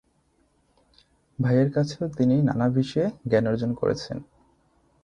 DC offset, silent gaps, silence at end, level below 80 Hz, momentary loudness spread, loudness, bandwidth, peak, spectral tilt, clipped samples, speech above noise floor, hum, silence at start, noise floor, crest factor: under 0.1%; none; 0.8 s; -56 dBFS; 10 LU; -24 LUFS; 9.6 kHz; -8 dBFS; -8 dB/octave; under 0.1%; 43 dB; none; 1.4 s; -66 dBFS; 18 dB